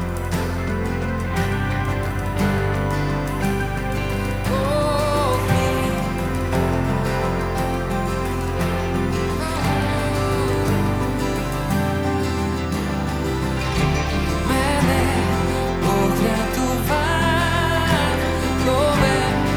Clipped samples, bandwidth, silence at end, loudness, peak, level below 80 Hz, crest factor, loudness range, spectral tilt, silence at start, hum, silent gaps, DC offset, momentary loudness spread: under 0.1%; over 20 kHz; 0 s; -21 LUFS; -4 dBFS; -30 dBFS; 16 dB; 3 LU; -5.5 dB/octave; 0 s; none; none; under 0.1%; 5 LU